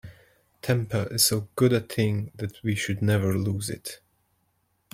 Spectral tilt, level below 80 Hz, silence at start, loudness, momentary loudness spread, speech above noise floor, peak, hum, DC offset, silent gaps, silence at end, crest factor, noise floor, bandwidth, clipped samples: -4.5 dB/octave; -58 dBFS; 0.05 s; -25 LUFS; 14 LU; 46 dB; -8 dBFS; none; under 0.1%; none; 1 s; 20 dB; -71 dBFS; 16.5 kHz; under 0.1%